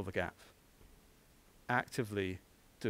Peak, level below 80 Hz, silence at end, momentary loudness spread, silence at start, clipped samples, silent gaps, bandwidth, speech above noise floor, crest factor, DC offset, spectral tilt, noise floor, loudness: -18 dBFS; -66 dBFS; 0 s; 18 LU; 0 s; under 0.1%; none; 16 kHz; 27 dB; 24 dB; under 0.1%; -5.5 dB/octave; -65 dBFS; -39 LUFS